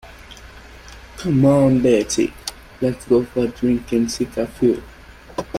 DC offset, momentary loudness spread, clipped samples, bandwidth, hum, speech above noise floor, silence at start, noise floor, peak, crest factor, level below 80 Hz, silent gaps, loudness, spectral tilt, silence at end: under 0.1%; 20 LU; under 0.1%; 15.5 kHz; none; 23 dB; 0.05 s; -40 dBFS; -4 dBFS; 16 dB; -42 dBFS; none; -19 LUFS; -6 dB/octave; 0 s